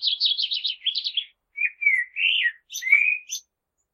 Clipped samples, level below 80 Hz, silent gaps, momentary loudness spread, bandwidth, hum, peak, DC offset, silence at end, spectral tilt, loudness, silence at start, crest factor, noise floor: under 0.1%; -84 dBFS; none; 12 LU; 13.5 kHz; none; -6 dBFS; under 0.1%; 0.55 s; 8 dB/octave; -21 LUFS; 0 s; 20 dB; -76 dBFS